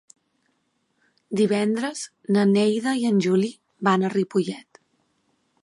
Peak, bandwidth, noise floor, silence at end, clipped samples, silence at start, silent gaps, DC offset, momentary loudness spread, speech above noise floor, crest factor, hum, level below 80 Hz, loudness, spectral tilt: -6 dBFS; 11.5 kHz; -71 dBFS; 1.05 s; under 0.1%; 1.3 s; none; under 0.1%; 11 LU; 49 dB; 18 dB; none; -74 dBFS; -23 LUFS; -6 dB/octave